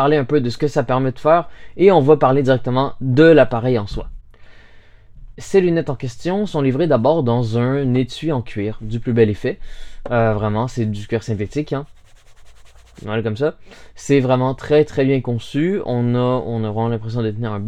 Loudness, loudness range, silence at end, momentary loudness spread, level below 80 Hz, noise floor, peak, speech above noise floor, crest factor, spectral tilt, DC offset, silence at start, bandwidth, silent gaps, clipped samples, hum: -18 LUFS; 8 LU; 0 s; 12 LU; -40 dBFS; -43 dBFS; 0 dBFS; 26 dB; 18 dB; -7.5 dB/octave; under 0.1%; 0 s; 10 kHz; none; under 0.1%; none